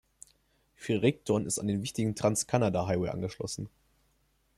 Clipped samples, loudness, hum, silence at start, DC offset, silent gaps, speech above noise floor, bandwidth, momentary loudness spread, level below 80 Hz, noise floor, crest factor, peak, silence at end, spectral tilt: under 0.1%; -30 LUFS; none; 0.8 s; under 0.1%; none; 41 dB; 13.5 kHz; 10 LU; -60 dBFS; -71 dBFS; 20 dB; -12 dBFS; 0.9 s; -5 dB/octave